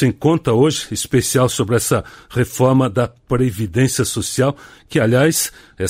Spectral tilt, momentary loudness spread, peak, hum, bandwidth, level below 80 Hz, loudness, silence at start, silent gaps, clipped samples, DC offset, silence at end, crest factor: -5 dB/octave; 7 LU; -2 dBFS; none; 16 kHz; -42 dBFS; -17 LUFS; 0 s; none; under 0.1%; under 0.1%; 0 s; 14 dB